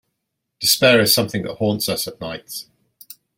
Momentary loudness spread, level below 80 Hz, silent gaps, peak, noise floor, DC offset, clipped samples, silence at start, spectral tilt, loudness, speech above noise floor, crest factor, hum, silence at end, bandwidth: 18 LU; -58 dBFS; none; 0 dBFS; -77 dBFS; under 0.1%; under 0.1%; 0.6 s; -3 dB/octave; -17 LUFS; 59 dB; 20 dB; none; 0.75 s; 16.5 kHz